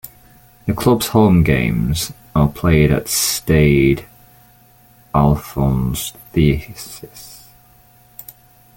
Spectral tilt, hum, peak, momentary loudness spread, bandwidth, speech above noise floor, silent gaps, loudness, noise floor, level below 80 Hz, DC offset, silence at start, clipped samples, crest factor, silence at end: -5.5 dB/octave; none; -2 dBFS; 22 LU; 17 kHz; 34 dB; none; -16 LUFS; -49 dBFS; -32 dBFS; under 0.1%; 0.05 s; under 0.1%; 16 dB; 1.4 s